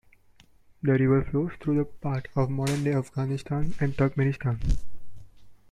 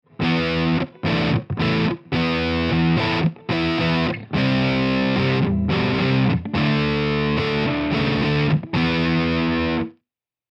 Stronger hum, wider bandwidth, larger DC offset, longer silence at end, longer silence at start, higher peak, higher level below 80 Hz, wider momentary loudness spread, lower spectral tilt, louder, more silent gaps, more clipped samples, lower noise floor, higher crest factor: neither; first, 12.5 kHz vs 7.4 kHz; neither; second, 0.15 s vs 0.6 s; first, 0.85 s vs 0.2 s; second, -12 dBFS vs -8 dBFS; about the same, -38 dBFS vs -40 dBFS; first, 8 LU vs 3 LU; about the same, -8 dB/octave vs -7.5 dB/octave; second, -27 LUFS vs -20 LUFS; neither; neither; second, -57 dBFS vs -82 dBFS; about the same, 16 dB vs 12 dB